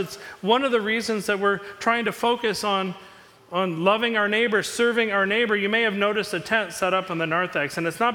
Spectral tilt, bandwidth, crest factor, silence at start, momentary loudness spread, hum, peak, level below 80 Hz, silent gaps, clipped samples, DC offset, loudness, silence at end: -4 dB/octave; 18.5 kHz; 18 dB; 0 s; 6 LU; none; -6 dBFS; -64 dBFS; none; under 0.1%; under 0.1%; -23 LUFS; 0 s